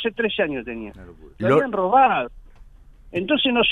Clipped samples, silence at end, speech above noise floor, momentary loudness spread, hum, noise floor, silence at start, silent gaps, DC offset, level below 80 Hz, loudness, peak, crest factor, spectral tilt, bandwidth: under 0.1%; 0 s; 25 dB; 17 LU; none; -46 dBFS; 0 s; none; under 0.1%; -48 dBFS; -20 LUFS; -4 dBFS; 16 dB; -6.5 dB/octave; 9.2 kHz